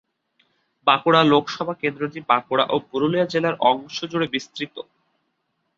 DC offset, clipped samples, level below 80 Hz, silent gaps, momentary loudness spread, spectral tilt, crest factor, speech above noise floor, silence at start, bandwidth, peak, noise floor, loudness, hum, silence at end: under 0.1%; under 0.1%; -66 dBFS; none; 13 LU; -5.5 dB/octave; 20 dB; 52 dB; 0.85 s; 7.6 kHz; -2 dBFS; -73 dBFS; -21 LUFS; none; 0.95 s